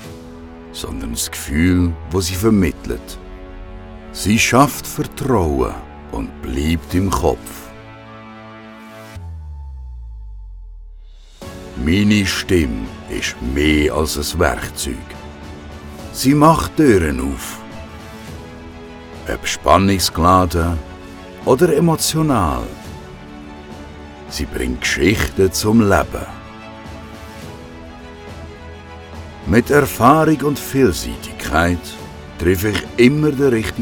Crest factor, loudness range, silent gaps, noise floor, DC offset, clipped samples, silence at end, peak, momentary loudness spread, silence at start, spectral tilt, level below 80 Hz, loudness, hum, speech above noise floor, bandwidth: 18 dB; 9 LU; none; -38 dBFS; under 0.1%; under 0.1%; 0 s; 0 dBFS; 22 LU; 0 s; -5 dB/octave; -32 dBFS; -16 LUFS; none; 22 dB; over 20 kHz